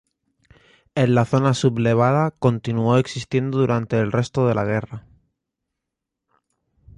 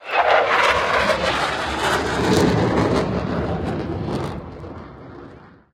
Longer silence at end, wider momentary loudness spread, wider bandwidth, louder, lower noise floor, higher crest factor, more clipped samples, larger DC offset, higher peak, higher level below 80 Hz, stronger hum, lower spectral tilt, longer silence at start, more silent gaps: first, 1.95 s vs 0.25 s; second, 7 LU vs 20 LU; second, 10.5 kHz vs 16 kHz; about the same, -20 LUFS vs -19 LUFS; first, -83 dBFS vs -43 dBFS; about the same, 18 dB vs 18 dB; neither; neither; about the same, -4 dBFS vs -2 dBFS; second, -52 dBFS vs -38 dBFS; neither; first, -7 dB/octave vs -5 dB/octave; first, 0.95 s vs 0 s; neither